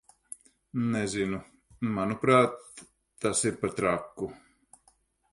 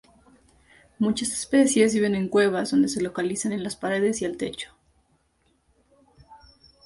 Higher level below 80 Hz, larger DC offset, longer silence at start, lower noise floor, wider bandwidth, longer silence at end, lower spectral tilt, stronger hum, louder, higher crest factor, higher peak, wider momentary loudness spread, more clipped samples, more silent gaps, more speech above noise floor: about the same, -60 dBFS vs -60 dBFS; neither; second, 0.75 s vs 1 s; about the same, -67 dBFS vs -67 dBFS; about the same, 11.5 kHz vs 11.5 kHz; first, 0.95 s vs 0.5 s; about the same, -5 dB/octave vs -4.5 dB/octave; neither; second, -29 LUFS vs -24 LUFS; about the same, 20 dB vs 20 dB; second, -10 dBFS vs -6 dBFS; first, 23 LU vs 10 LU; neither; neither; second, 39 dB vs 44 dB